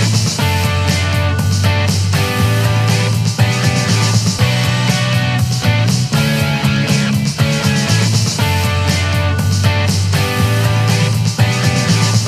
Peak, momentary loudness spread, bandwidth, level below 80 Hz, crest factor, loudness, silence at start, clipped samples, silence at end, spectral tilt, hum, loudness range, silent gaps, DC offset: 0 dBFS; 2 LU; 15 kHz; -36 dBFS; 14 dB; -14 LUFS; 0 s; under 0.1%; 0 s; -4.5 dB/octave; none; 0 LU; none; under 0.1%